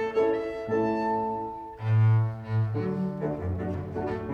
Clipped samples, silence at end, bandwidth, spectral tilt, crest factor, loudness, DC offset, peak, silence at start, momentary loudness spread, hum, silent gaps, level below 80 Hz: under 0.1%; 0 s; 5 kHz; -10 dB/octave; 12 dB; -28 LUFS; under 0.1%; -14 dBFS; 0 s; 9 LU; none; none; -52 dBFS